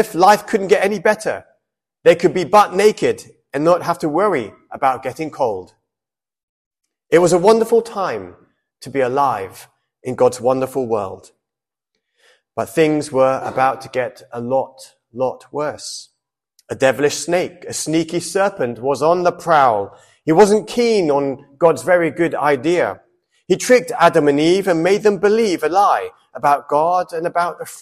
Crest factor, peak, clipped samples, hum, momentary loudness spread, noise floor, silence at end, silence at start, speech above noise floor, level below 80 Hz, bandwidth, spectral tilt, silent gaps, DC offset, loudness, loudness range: 16 dB; 0 dBFS; under 0.1%; none; 13 LU; -89 dBFS; 0 s; 0 s; 73 dB; -58 dBFS; 15 kHz; -5 dB/octave; 6.43-6.71 s; under 0.1%; -17 LUFS; 6 LU